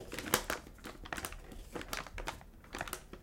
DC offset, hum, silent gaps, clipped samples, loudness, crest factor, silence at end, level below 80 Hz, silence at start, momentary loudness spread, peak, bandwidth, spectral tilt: under 0.1%; none; none; under 0.1%; -41 LUFS; 32 dB; 0 s; -52 dBFS; 0 s; 16 LU; -10 dBFS; 17 kHz; -2.5 dB/octave